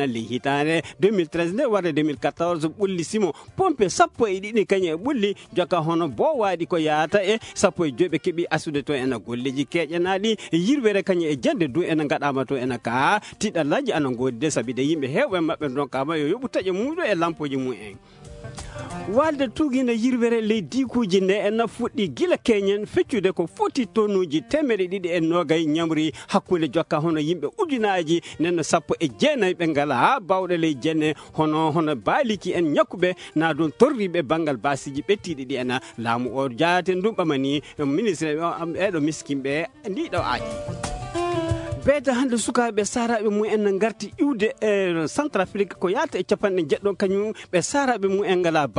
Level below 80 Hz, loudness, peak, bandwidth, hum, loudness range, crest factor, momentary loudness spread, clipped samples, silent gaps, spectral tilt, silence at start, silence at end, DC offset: -54 dBFS; -23 LUFS; -4 dBFS; 11 kHz; none; 3 LU; 20 dB; 5 LU; under 0.1%; none; -5 dB/octave; 0 s; 0 s; under 0.1%